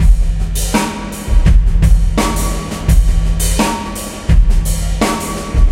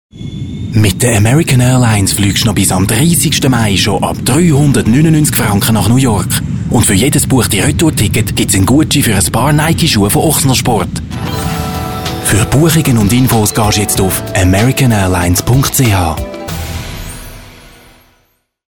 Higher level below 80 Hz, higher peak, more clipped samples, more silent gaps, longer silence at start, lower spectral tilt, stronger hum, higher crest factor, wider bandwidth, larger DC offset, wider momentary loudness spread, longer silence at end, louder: first, -12 dBFS vs -28 dBFS; about the same, 0 dBFS vs 0 dBFS; neither; neither; second, 0 s vs 0.15 s; about the same, -5 dB/octave vs -4.5 dB/octave; neither; about the same, 12 dB vs 10 dB; second, 16 kHz vs 19.5 kHz; second, under 0.1% vs 1%; second, 7 LU vs 10 LU; second, 0 s vs 1.2 s; second, -15 LUFS vs -10 LUFS